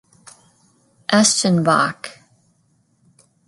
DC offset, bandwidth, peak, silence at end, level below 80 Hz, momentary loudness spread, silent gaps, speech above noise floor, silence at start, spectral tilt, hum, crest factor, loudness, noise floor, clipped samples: under 0.1%; 11.5 kHz; 0 dBFS; 1.35 s; -66 dBFS; 20 LU; none; 46 dB; 1.1 s; -3.5 dB/octave; none; 20 dB; -16 LUFS; -62 dBFS; under 0.1%